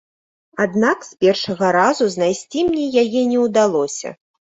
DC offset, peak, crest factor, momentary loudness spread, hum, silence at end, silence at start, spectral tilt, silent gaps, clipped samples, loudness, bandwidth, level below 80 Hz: under 0.1%; -2 dBFS; 16 dB; 7 LU; none; 0.35 s; 0.55 s; -4.5 dB/octave; none; under 0.1%; -17 LUFS; 8.2 kHz; -58 dBFS